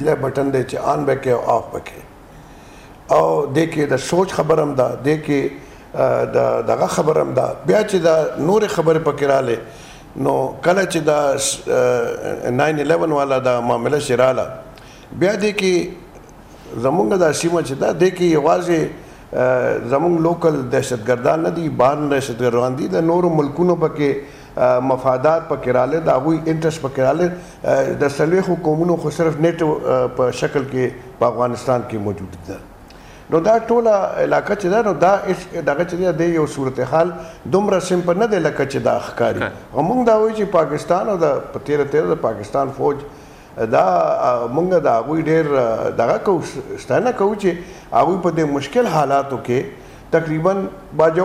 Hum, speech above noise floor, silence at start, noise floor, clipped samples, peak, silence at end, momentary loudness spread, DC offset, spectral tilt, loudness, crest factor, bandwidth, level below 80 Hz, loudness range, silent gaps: none; 23 dB; 0 s; -40 dBFS; under 0.1%; -4 dBFS; 0 s; 7 LU; under 0.1%; -6 dB/octave; -18 LUFS; 14 dB; 15.5 kHz; -48 dBFS; 2 LU; none